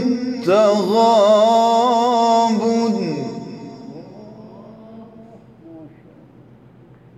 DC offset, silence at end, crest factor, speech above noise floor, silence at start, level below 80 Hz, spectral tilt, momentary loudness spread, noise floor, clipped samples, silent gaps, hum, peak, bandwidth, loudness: under 0.1%; 1.3 s; 14 dB; 33 dB; 0 s; -66 dBFS; -5.5 dB/octave; 22 LU; -46 dBFS; under 0.1%; none; none; -4 dBFS; 12.5 kHz; -15 LUFS